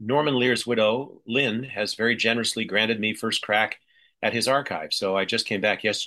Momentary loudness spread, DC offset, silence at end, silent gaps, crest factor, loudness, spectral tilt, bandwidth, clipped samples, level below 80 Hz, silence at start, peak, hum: 6 LU; under 0.1%; 0 s; none; 18 dB; -24 LUFS; -3.5 dB/octave; 12.5 kHz; under 0.1%; -70 dBFS; 0 s; -8 dBFS; none